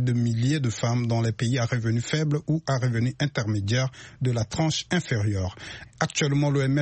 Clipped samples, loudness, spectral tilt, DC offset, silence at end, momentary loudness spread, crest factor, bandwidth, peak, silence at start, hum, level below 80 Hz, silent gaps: under 0.1%; -26 LUFS; -5.5 dB/octave; under 0.1%; 0 s; 6 LU; 14 dB; 8.6 kHz; -10 dBFS; 0 s; none; -54 dBFS; none